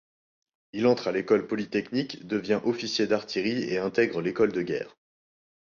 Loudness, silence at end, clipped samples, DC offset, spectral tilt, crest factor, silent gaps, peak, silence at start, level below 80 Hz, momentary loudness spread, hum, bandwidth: -27 LUFS; 0.9 s; under 0.1%; under 0.1%; -5.5 dB/octave; 18 dB; none; -10 dBFS; 0.75 s; -66 dBFS; 7 LU; none; 7.2 kHz